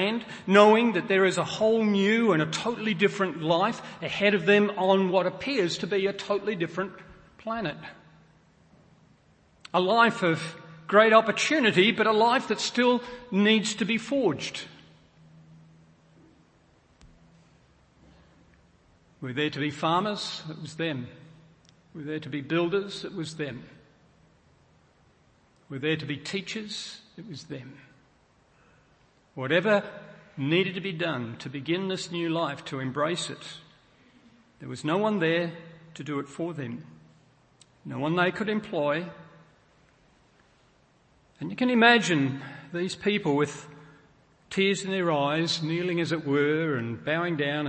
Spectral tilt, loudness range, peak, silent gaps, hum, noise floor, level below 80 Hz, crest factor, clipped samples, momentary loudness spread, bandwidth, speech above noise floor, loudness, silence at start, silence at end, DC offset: -5 dB/octave; 12 LU; -4 dBFS; none; none; -63 dBFS; -68 dBFS; 24 dB; under 0.1%; 19 LU; 8.8 kHz; 37 dB; -26 LUFS; 0 s; 0 s; under 0.1%